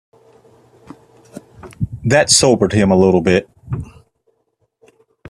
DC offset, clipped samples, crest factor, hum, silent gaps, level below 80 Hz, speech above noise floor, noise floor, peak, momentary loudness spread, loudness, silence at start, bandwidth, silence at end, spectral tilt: under 0.1%; under 0.1%; 18 dB; none; none; -44 dBFS; 54 dB; -66 dBFS; 0 dBFS; 17 LU; -13 LUFS; 1.35 s; 13.5 kHz; 1.45 s; -4 dB/octave